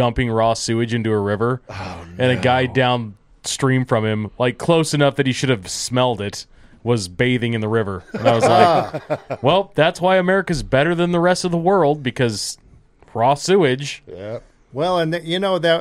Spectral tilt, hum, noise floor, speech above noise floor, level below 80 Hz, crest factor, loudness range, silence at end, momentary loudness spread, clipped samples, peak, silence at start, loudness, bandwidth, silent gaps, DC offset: -5 dB/octave; none; -49 dBFS; 31 dB; -44 dBFS; 18 dB; 3 LU; 0 s; 13 LU; under 0.1%; 0 dBFS; 0 s; -18 LUFS; 14.5 kHz; none; under 0.1%